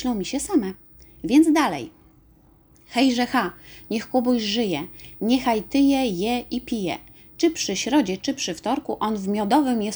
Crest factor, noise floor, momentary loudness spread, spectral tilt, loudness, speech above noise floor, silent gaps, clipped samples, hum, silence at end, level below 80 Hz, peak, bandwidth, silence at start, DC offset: 20 dB; -55 dBFS; 11 LU; -4 dB/octave; -23 LUFS; 33 dB; none; under 0.1%; none; 0 s; -52 dBFS; -4 dBFS; over 20 kHz; 0 s; under 0.1%